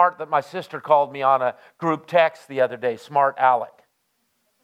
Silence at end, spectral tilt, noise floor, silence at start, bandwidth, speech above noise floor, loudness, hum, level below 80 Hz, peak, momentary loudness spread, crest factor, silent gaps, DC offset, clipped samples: 1 s; -6 dB/octave; -70 dBFS; 0 s; 14 kHz; 49 dB; -21 LUFS; none; -80 dBFS; -2 dBFS; 9 LU; 20 dB; none; under 0.1%; under 0.1%